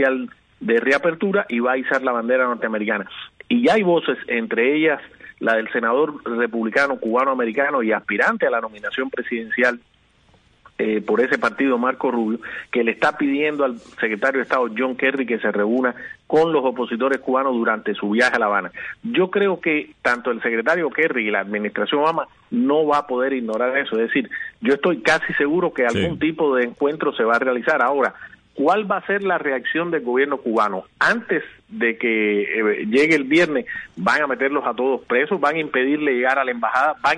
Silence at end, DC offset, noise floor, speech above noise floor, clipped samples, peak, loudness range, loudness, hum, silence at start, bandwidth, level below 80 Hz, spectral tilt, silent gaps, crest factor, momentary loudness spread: 0 s; under 0.1%; -56 dBFS; 36 dB; under 0.1%; -4 dBFS; 2 LU; -20 LUFS; none; 0 s; 10 kHz; -60 dBFS; -5.5 dB/octave; none; 16 dB; 7 LU